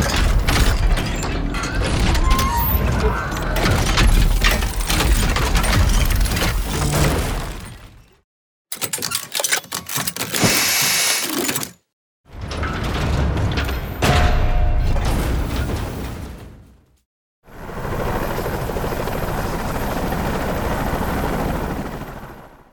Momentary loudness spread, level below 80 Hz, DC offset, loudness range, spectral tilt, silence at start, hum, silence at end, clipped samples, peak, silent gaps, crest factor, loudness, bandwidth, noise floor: 11 LU; -22 dBFS; under 0.1%; 8 LU; -4 dB/octave; 0 s; none; 0.25 s; under 0.1%; -2 dBFS; 8.24-8.65 s, 11.93-12.24 s, 17.05-17.42 s; 18 dB; -20 LUFS; over 20 kHz; -48 dBFS